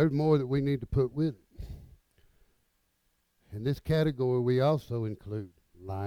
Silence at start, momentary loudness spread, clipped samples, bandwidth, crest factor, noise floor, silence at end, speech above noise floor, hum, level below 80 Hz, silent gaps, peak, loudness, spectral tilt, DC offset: 0 s; 20 LU; under 0.1%; 14.5 kHz; 18 dB; -74 dBFS; 0 s; 46 dB; none; -50 dBFS; none; -12 dBFS; -30 LUFS; -9 dB/octave; under 0.1%